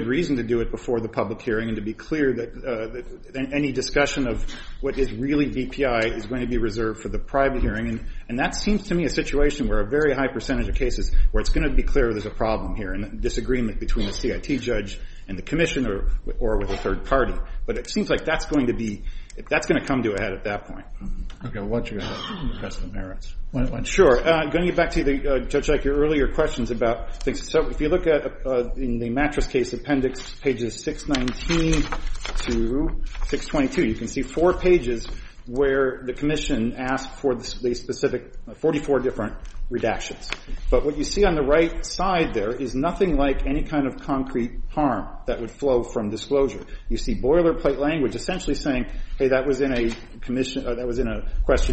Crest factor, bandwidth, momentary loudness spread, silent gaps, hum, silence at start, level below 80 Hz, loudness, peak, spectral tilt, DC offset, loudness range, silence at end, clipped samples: 18 dB; 8.4 kHz; 11 LU; none; none; 0 s; -28 dBFS; -24 LUFS; -4 dBFS; -5.5 dB/octave; under 0.1%; 4 LU; 0 s; under 0.1%